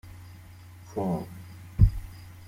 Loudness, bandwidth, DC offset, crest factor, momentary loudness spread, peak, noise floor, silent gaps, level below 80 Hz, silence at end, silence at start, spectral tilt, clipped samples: -28 LUFS; 15.5 kHz; under 0.1%; 24 dB; 24 LU; -6 dBFS; -47 dBFS; none; -34 dBFS; 0.05 s; 0.05 s; -9 dB/octave; under 0.1%